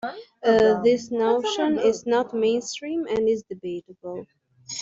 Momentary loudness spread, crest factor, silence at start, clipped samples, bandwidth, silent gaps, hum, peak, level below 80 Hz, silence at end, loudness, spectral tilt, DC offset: 16 LU; 16 dB; 0.05 s; under 0.1%; 7.8 kHz; none; none; -8 dBFS; -60 dBFS; 0 s; -23 LUFS; -4 dB/octave; under 0.1%